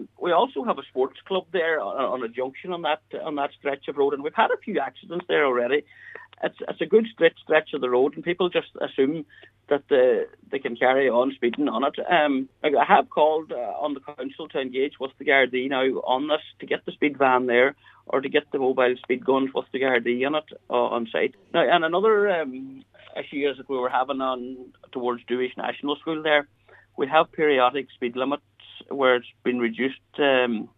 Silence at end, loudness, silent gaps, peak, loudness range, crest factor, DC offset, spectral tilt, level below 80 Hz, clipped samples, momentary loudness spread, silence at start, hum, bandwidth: 0.1 s; -24 LUFS; none; -2 dBFS; 4 LU; 22 dB; under 0.1%; -7 dB/octave; -72 dBFS; under 0.1%; 11 LU; 0 s; none; 4 kHz